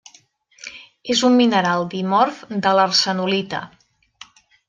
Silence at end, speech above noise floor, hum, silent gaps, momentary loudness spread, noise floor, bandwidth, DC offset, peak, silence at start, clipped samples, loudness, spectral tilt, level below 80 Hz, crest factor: 1 s; 36 dB; none; none; 21 LU; -54 dBFS; 9.8 kHz; under 0.1%; -2 dBFS; 0.65 s; under 0.1%; -18 LUFS; -4 dB/octave; -64 dBFS; 18 dB